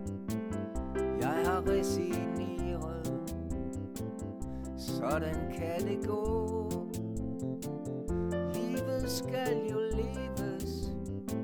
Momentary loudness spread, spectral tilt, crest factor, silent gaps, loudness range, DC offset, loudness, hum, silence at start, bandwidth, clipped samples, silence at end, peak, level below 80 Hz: 8 LU; -6 dB/octave; 16 dB; none; 3 LU; under 0.1%; -35 LUFS; none; 0 s; over 20 kHz; under 0.1%; 0 s; -18 dBFS; -46 dBFS